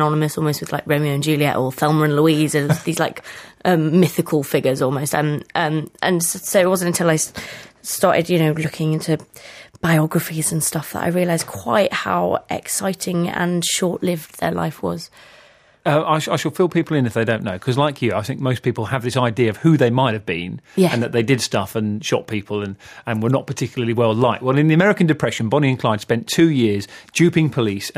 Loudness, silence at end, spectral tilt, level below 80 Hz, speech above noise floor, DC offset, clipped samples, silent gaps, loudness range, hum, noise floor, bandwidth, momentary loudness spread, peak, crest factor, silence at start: -19 LUFS; 0.05 s; -5 dB/octave; -56 dBFS; 31 dB; under 0.1%; under 0.1%; none; 4 LU; none; -50 dBFS; 15.5 kHz; 9 LU; -2 dBFS; 16 dB; 0 s